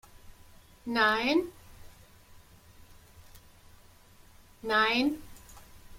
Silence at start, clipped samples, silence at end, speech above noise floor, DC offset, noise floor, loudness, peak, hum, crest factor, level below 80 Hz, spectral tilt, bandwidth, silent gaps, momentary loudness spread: 0.25 s; under 0.1%; 0 s; 29 dB; under 0.1%; -56 dBFS; -27 LUFS; -14 dBFS; none; 20 dB; -58 dBFS; -4 dB/octave; 16.5 kHz; none; 20 LU